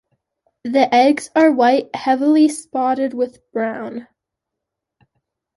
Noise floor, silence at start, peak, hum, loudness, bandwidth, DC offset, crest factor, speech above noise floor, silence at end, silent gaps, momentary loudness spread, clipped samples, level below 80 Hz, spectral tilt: -81 dBFS; 0.65 s; -2 dBFS; none; -17 LUFS; 11.5 kHz; under 0.1%; 16 dB; 65 dB; 1.55 s; none; 13 LU; under 0.1%; -68 dBFS; -4 dB/octave